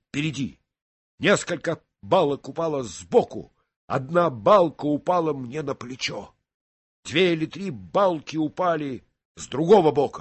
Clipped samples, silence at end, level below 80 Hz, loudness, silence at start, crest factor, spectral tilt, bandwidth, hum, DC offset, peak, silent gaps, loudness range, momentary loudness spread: under 0.1%; 0 s; -60 dBFS; -23 LUFS; 0.15 s; 18 dB; -5.5 dB/octave; 8.6 kHz; none; under 0.1%; -4 dBFS; 0.82-1.18 s, 3.76-3.88 s, 6.54-7.03 s, 9.25-9.35 s; 3 LU; 15 LU